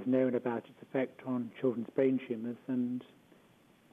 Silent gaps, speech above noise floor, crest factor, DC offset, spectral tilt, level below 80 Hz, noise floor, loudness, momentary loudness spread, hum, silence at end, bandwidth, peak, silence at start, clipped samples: none; 30 dB; 16 dB; under 0.1%; -9 dB/octave; -84 dBFS; -64 dBFS; -35 LUFS; 9 LU; none; 0.9 s; 3.8 kHz; -18 dBFS; 0 s; under 0.1%